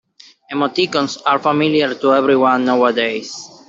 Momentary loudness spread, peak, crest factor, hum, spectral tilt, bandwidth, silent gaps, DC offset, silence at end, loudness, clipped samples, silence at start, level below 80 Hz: 7 LU; -2 dBFS; 14 dB; none; -4.5 dB/octave; 7.8 kHz; none; under 0.1%; 0.2 s; -16 LUFS; under 0.1%; 0.5 s; -64 dBFS